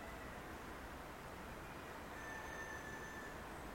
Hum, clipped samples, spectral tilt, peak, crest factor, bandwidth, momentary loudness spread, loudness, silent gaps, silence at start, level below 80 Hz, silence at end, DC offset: none; under 0.1%; -4 dB/octave; -36 dBFS; 14 dB; 16 kHz; 4 LU; -50 LUFS; none; 0 s; -60 dBFS; 0 s; under 0.1%